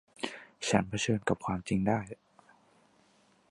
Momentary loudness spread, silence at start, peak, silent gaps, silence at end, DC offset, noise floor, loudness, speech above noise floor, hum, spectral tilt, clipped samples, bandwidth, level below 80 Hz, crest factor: 11 LU; 0.2 s; -8 dBFS; none; 1.35 s; under 0.1%; -66 dBFS; -32 LUFS; 36 dB; none; -5 dB/octave; under 0.1%; 11.5 kHz; -58 dBFS; 26 dB